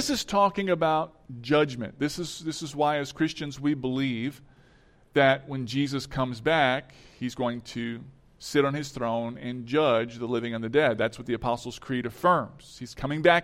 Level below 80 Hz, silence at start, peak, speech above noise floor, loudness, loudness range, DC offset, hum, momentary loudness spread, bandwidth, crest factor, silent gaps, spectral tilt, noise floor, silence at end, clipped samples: -56 dBFS; 0 s; -6 dBFS; 31 dB; -27 LUFS; 3 LU; under 0.1%; none; 12 LU; 16 kHz; 22 dB; none; -5 dB/octave; -58 dBFS; 0 s; under 0.1%